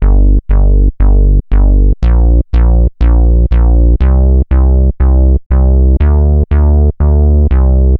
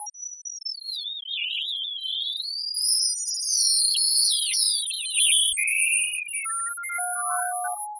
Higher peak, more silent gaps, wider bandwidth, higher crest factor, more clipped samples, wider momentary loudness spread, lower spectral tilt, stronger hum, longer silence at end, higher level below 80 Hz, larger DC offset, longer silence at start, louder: first, 0 dBFS vs -8 dBFS; first, 5.46-5.50 s vs none; second, 2.9 kHz vs 11.5 kHz; second, 6 dB vs 18 dB; neither; second, 2 LU vs 12 LU; first, -12 dB/octave vs 8.5 dB/octave; neither; about the same, 0 s vs 0 s; first, -8 dBFS vs -78 dBFS; neither; about the same, 0 s vs 0 s; first, -10 LUFS vs -22 LUFS